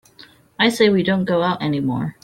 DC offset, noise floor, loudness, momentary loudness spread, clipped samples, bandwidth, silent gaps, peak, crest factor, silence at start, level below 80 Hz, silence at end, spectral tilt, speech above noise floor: under 0.1%; -48 dBFS; -18 LUFS; 6 LU; under 0.1%; 15 kHz; none; -2 dBFS; 16 dB; 0.2 s; -56 dBFS; 0.1 s; -6 dB/octave; 30 dB